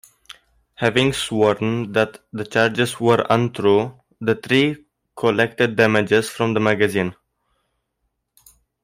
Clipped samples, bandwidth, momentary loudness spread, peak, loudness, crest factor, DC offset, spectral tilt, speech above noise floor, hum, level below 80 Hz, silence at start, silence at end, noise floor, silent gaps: under 0.1%; 16 kHz; 7 LU; -2 dBFS; -19 LUFS; 18 dB; under 0.1%; -5.5 dB/octave; 55 dB; none; -56 dBFS; 0.8 s; 1.7 s; -74 dBFS; none